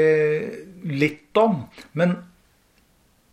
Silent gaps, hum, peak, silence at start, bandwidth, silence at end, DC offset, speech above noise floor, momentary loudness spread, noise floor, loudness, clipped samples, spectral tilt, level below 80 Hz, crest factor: none; none; -6 dBFS; 0 s; 13 kHz; 1.1 s; under 0.1%; 38 dB; 13 LU; -60 dBFS; -23 LUFS; under 0.1%; -7.5 dB/octave; -64 dBFS; 18 dB